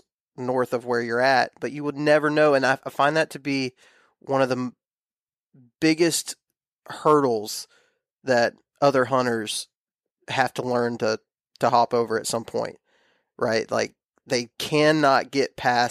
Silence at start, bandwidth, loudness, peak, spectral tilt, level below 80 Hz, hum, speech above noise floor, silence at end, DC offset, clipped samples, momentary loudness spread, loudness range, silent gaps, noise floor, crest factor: 0.4 s; 15.5 kHz; -23 LUFS; -6 dBFS; -4 dB/octave; -68 dBFS; none; over 67 dB; 0 s; under 0.1%; under 0.1%; 12 LU; 4 LU; 4.93-5.27 s, 5.39-5.50 s, 6.68-6.77 s, 8.13-8.17 s, 9.77-9.86 s, 9.94-9.99 s, 10.11-10.15 s, 14.05-14.09 s; under -90 dBFS; 18 dB